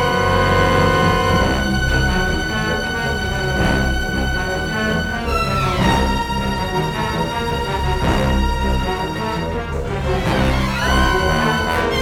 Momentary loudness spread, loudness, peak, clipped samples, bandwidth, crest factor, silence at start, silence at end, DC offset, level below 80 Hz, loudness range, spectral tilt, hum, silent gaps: 6 LU; -18 LUFS; -2 dBFS; under 0.1%; 17.5 kHz; 16 dB; 0 s; 0 s; under 0.1%; -24 dBFS; 3 LU; -5 dB/octave; none; none